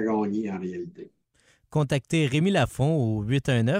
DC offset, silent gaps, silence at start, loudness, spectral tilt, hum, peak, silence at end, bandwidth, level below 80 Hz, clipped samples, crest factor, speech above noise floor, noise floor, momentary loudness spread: under 0.1%; none; 0 s; -25 LUFS; -6.5 dB/octave; none; -12 dBFS; 0 s; 15.5 kHz; -52 dBFS; under 0.1%; 14 dB; 39 dB; -64 dBFS; 11 LU